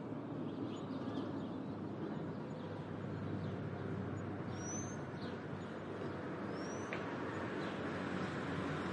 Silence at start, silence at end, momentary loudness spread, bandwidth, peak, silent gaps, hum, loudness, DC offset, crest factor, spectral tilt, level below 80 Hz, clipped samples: 0 s; 0 s; 4 LU; 10.5 kHz; -26 dBFS; none; none; -43 LUFS; under 0.1%; 18 dB; -6 dB/octave; -74 dBFS; under 0.1%